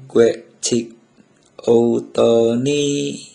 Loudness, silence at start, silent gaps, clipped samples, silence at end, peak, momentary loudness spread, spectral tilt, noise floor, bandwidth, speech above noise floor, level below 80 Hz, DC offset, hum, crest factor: -17 LUFS; 0 s; none; under 0.1%; 0.1 s; 0 dBFS; 9 LU; -5 dB/octave; -53 dBFS; 10.5 kHz; 37 dB; -58 dBFS; under 0.1%; none; 16 dB